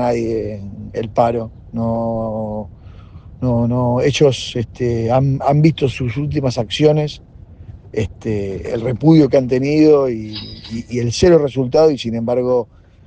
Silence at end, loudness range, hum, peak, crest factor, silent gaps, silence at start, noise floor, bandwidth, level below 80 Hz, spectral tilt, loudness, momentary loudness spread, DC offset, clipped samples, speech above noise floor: 0.4 s; 5 LU; none; 0 dBFS; 16 dB; none; 0 s; -37 dBFS; 9.2 kHz; -42 dBFS; -7 dB/octave; -16 LUFS; 15 LU; under 0.1%; under 0.1%; 22 dB